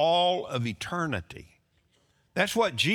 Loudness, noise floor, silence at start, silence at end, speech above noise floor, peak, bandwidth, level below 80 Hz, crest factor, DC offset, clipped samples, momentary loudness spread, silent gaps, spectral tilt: -28 LUFS; -68 dBFS; 0 s; 0 s; 41 dB; -10 dBFS; 19 kHz; -62 dBFS; 18 dB; under 0.1%; under 0.1%; 13 LU; none; -4 dB/octave